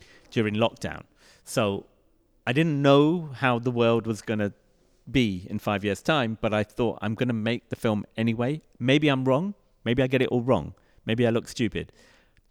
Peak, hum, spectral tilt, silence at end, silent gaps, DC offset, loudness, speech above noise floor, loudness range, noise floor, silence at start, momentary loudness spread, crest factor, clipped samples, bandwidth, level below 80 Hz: -8 dBFS; none; -6.5 dB/octave; 0.65 s; none; under 0.1%; -26 LUFS; 39 dB; 3 LU; -64 dBFS; 0.3 s; 10 LU; 18 dB; under 0.1%; 16 kHz; -54 dBFS